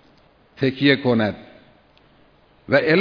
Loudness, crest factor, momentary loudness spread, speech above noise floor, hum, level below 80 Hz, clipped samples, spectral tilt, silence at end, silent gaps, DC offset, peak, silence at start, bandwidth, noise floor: -19 LUFS; 22 dB; 8 LU; 37 dB; none; -58 dBFS; under 0.1%; -8 dB/octave; 0 s; none; under 0.1%; 0 dBFS; 0.6 s; 5.4 kHz; -55 dBFS